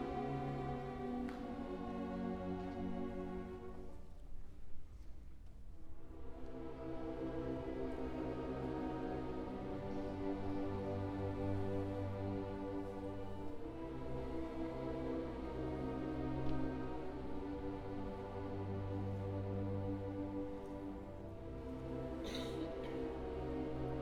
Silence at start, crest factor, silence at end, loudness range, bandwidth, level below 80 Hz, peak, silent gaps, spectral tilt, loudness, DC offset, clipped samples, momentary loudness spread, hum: 0 s; 16 dB; 0 s; 6 LU; 12 kHz; -54 dBFS; -28 dBFS; none; -8 dB/octave; -44 LUFS; under 0.1%; under 0.1%; 12 LU; none